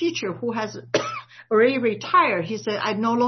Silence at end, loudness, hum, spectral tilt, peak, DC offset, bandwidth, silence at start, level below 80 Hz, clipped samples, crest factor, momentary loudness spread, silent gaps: 0 s; -22 LUFS; none; -4.5 dB/octave; -6 dBFS; under 0.1%; 6.4 kHz; 0 s; -70 dBFS; under 0.1%; 16 dB; 9 LU; none